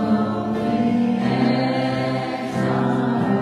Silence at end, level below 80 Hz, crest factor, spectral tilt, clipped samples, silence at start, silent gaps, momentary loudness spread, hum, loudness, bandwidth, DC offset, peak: 0 s; -54 dBFS; 12 dB; -7.5 dB/octave; under 0.1%; 0 s; none; 4 LU; none; -21 LUFS; 11 kHz; under 0.1%; -8 dBFS